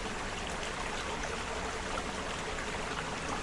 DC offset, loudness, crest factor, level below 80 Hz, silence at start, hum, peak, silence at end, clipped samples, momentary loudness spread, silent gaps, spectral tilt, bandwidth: under 0.1%; -36 LUFS; 18 dB; -46 dBFS; 0 s; none; -20 dBFS; 0 s; under 0.1%; 1 LU; none; -3 dB/octave; 11.5 kHz